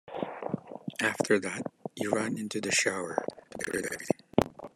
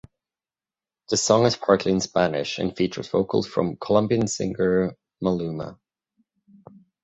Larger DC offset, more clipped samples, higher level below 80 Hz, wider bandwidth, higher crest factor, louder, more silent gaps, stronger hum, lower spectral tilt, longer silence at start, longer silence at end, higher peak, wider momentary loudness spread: neither; neither; second, -64 dBFS vs -54 dBFS; first, 14 kHz vs 8.4 kHz; first, 26 dB vs 20 dB; second, -31 LUFS vs -23 LUFS; neither; neither; second, -3.5 dB/octave vs -5 dB/octave; second, 0.05 s vs 1.1 s; second, 0.1 s vs 1.3 s; about the same, -6 dBFS vs -4 dBFS; first, 12 LU vs 9 LU